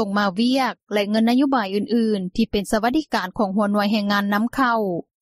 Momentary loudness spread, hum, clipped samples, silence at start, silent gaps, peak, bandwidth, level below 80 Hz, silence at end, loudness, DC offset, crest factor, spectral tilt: 4 LU; none; under 0.1%; 0 s; 0.83-0.87 s; -6 dBFS; 15 kHz; -48 dBFS; 0.2 s; -21 LUFS; under 0.1%; 14 dB; -5.5 dB/octave